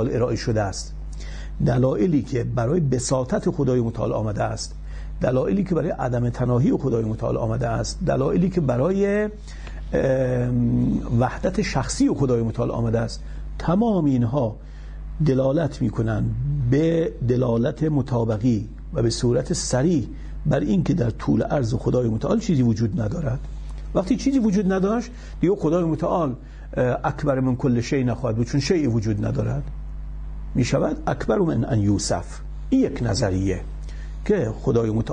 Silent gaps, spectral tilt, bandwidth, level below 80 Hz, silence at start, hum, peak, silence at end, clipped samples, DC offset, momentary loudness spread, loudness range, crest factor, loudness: none; -7 dB/octave; 10 kHz; -34 dBFS; 0 s; none; -8 dBFS; 0 s; under 0.1%; under 0.1%; 11 LU; 2 LU; 14 dB; -22 LUFS